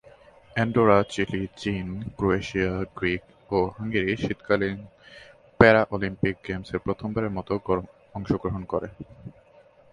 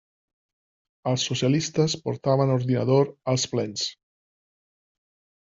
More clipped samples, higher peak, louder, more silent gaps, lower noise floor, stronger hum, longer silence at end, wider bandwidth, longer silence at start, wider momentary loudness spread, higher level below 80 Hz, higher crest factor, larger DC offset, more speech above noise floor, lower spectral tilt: neither; first, 0 dBFS vs -8 dBFS; about the same, -25 LUFS vs -24 LUFS; neither; second, -55 dBFS vs under -90 dBFS; neither; second, 0.6 s vs 1.55 s; first, 11 kHz vs 7.8 kHz; second, 0.55 s vs 1.05 s; first, 14 LU vs 7 LU; first, -48 dBFS vs -62 dBFS; first, 26 dB vs 18 dB; neither; second, 30 dB vs over 67 dB; first, -7 dB/octave vs -5.5 dB/octave